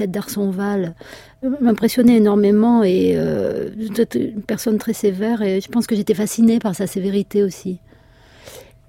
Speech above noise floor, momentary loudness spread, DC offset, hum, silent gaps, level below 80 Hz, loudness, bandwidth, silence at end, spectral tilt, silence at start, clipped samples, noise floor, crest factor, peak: 31 dB; 11 LU; under 0.1%; none; none; -52 dBFS; -18 LUFS; 16.5 kHz; 0.25 s; -6.5 dB/octave; 0 s; under 0.1%; -48 dBFS; 14 dB; -4 dBFS